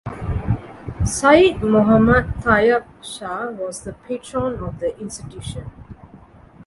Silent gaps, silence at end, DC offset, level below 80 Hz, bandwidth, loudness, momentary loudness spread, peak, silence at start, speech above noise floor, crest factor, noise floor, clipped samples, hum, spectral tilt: none; 0.5 s; under 0.1%; -34 dBFS; 11.5 kHz; -18 LUFS; 18 LU; 0 dBFS; 0.05 s; 27 dB; 20 dB; -45 dBFS; under 0.1%; none; -5.5 dB/octave